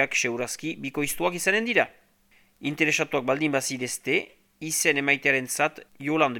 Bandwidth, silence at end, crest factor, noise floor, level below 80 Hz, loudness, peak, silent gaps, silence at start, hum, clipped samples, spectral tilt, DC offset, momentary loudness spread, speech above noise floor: 19 kHz; 0 s; 22 dB; -61 dBFS; -64 dBFS; -25 LUFS; -6 dBFS; none; 0 s; none; under 0.1%; -3 dB/octave; under 0.1%; 10 LU; 36 dB